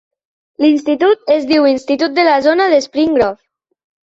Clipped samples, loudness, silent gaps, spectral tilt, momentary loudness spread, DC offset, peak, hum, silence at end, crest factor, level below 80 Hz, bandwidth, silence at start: under 0.1%; -13 LUFS; none; -4 dB/octave; 4 LU; under 0.1%; -2 dBFS; none; 0.7 s; 12 dB; -54 dBFS; 7.8 kHz; 0.6 s